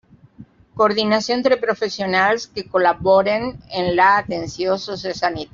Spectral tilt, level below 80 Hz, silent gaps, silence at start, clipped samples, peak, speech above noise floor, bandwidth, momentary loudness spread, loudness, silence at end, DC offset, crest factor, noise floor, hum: -2.5 dB/octave; -52 dBFS; none; 0.4 s; under 0.1%; -2 dBFS; 27 dB; 7.6 kHz; 9 LU; -19 LUFS; 0.1 s; under 0.1%; 16 dB; -45 dBFS; none